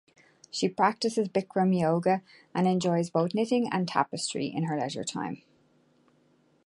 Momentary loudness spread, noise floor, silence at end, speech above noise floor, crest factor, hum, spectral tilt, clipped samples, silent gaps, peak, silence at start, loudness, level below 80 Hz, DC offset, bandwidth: 8 LU; -66 dBFS; 1.3 s; 38 dB; 20 dB; none; -5.5 dB/octave; under 0.1%; none; -8 dBFS; 0.55 s; -28 LUFS; -72 dBFS; under 0.1%; 11.5 kHz